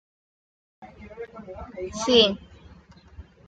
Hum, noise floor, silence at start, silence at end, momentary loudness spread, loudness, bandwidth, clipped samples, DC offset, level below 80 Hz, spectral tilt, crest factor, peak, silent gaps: none; -51 dBFS; 0.8 s; 0.25 s; 23 LU; -21 LUFS; 9.2 kHz; under 0.1%; under 0.1%; -52 dBFS; -3.5 dB/octave; 24 dB; -4 dBFS; none